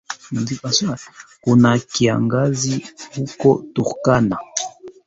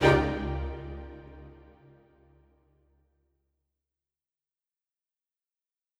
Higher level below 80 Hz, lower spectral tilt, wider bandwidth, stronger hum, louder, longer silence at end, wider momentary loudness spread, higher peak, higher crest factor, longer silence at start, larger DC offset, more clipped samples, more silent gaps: second, -52 dBFS vs -44 dBFS; second, -5 dB/octave vs -6.5 dB/octave; second, 8 kHz vs 12 kHz; neither; first, -19 LUFS vs -30 LUFS; second, 0.15 s vs 4.45 s; second, 13 LU vs 25 LU; first, -2 dBFS vs -8 dBFS; second, 18 dB vs 26 dB; about the same, 0.1 s vs 0 s; neither; neither; neither